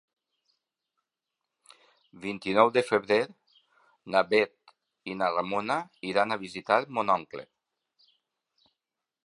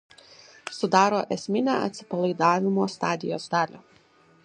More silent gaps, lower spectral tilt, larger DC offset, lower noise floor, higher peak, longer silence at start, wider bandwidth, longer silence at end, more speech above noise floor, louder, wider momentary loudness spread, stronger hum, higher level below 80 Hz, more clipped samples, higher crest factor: neither; about the same, -5 dB/octave vs -5.5 dB/octave; neither; first, -88 dBFS vs -58 dBFS; about the same, -6 dBFS vs -4 dBFS; first, 2.15 s vs 0.65 s; first, 11.5 kHz vs 10 kHz; first, 1.8 s vs 0.65 s; first, 61 dB vs 34 dB; about the same, -27 LUFS vs -25 LUFS; first, 15 LU vs 10 LU; neither; about the same, -72 dBFS vs -72 dBFS; neither; about the same, 24 dB vs 22 dB